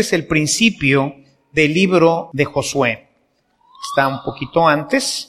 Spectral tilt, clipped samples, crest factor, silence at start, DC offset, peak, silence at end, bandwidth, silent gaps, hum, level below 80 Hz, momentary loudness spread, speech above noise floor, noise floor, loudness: -4 dB/octave; under 0.1%; 16 dB; 0 s; under 0.1%; 0 dBFS; 0.05 s; 15 kHz; none; none; -48 dBFS; 9 LU; 46 dB; -62 dBFS; -16 LUFS